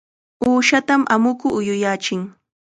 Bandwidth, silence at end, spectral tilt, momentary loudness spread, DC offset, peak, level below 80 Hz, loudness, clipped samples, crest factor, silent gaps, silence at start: 9.4 kHz; 0.5 s; -4 dB/octave; 9 LU; under 0.1%; -2 dBFS; -58 dBFS; -18 LUFS; under 0.1%; 18 dB; none; 0.4 s